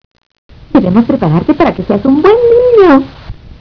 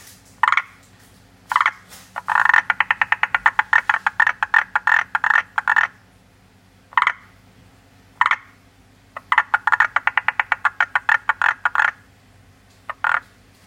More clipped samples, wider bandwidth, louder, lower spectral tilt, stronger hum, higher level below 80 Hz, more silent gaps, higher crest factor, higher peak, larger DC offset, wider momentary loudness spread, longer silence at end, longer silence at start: first, 2% vs under 0.1%; second, 5.4 kHz vs 16.5 kHz; first, -8 LUFS vs -18 LUFS; first, -9.5 dB/octave vs -1 dB/octave; neither; first, -34 dBFS vs -60 dBFS; neither; second, 8 dB vs 22 dB; about the same, 0 dBFS vs 0 dBFS; neither; about the same, 7 LU vs 8 LU; second, 0.3 s vs 0.45 s; first, 0.75 s vs 0.45 s